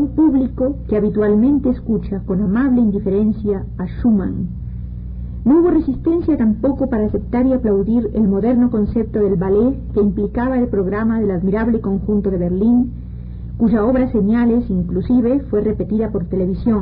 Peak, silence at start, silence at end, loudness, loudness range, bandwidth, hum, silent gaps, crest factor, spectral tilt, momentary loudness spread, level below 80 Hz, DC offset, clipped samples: -6 dBFS; 0 s; 0 s; -17 LUFS; 2 LU; 4.3 kHz; 60 Hz at -30 dBFS; none; 10 dB; -14.5 dB/octave; 7 LU; -30 dBFS; under 0.1%; under 0.1%